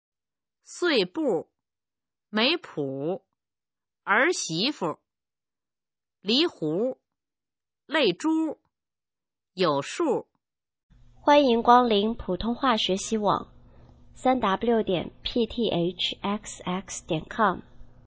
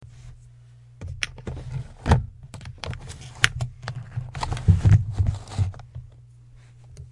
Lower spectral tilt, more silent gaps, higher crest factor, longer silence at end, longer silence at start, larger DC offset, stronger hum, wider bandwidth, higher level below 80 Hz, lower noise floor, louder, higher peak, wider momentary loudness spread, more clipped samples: about the same, -4 dB/octave vs -5 dB/octave; first, 10.83-10.89 s vs none; about the same, 22 dB vs 26 dB; first, 0.2 s vs 0 s; first, 0.7 s vs 0 s; neither; neither; second, 8 kHz vs 11.5 kHz; second, -54 dBFS vs -36 dBFS; first, under -90 dBFS vs -49 dBFS; about the same, -25 LUFS vs -25 LUFS; second, -4 dBFS vs 0 dBFS; second, 12 LU vs 22 LU; neither